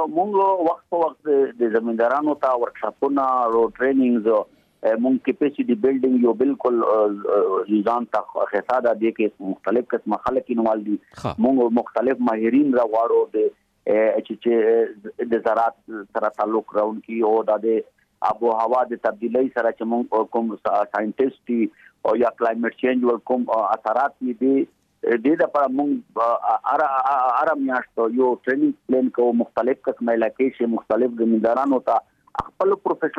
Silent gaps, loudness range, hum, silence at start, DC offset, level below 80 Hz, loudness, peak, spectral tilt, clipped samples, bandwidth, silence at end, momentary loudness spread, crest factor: none; 2 LU; none; 0 s; under 0.1%; -62 dBFS; -21 LUFS; -8 dBFS; -8 dB/octave; under 0.1%; 6.8 kHz; 0 s; 6 LU; 14 dB